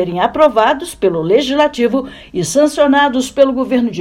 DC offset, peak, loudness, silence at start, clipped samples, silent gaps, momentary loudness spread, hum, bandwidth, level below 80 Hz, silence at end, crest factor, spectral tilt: under 0.1%; 0 dBFS; -13 LUFS; 0 s; 0.2%; none; 6 LU; none; 16 kHz; -44 dBFS; 0 s; 14 dB; -4.5 dB/octave